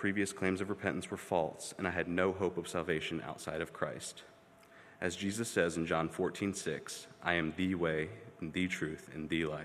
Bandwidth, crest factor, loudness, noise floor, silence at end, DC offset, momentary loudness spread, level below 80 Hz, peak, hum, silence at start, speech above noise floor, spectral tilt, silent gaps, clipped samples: 15 kHz; 22 dB; -36 LUFS; -60 dBFS; 0 s; under 0.1%; 8 LU; -68 dBFS; -14 dBFS; none; 0 s; 24 dB; -4.5 dB/octave; none; under 0.1%